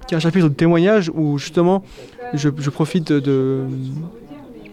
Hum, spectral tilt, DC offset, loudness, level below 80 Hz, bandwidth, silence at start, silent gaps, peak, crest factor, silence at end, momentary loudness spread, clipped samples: none; -7 dB/octave; under 0.1%; -18 LUFS; -50 dBFS; 11.5 kHz; 0 s; none; -6 dBFS; 12 dB; 0 s; 18 LU; under 0.1%